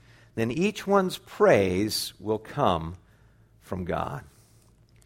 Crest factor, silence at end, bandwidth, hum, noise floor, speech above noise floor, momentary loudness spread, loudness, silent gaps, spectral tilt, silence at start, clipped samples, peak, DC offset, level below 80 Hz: 20 dB; 0.8 s; 16.5 kHz; none; -58 dBFS; 33 dB; 16 LU; -26 LUFS; none; -5 dB/octave; 0.35 s; under 0.1%; -6 dBFS; under 0.1%; -54 dBFS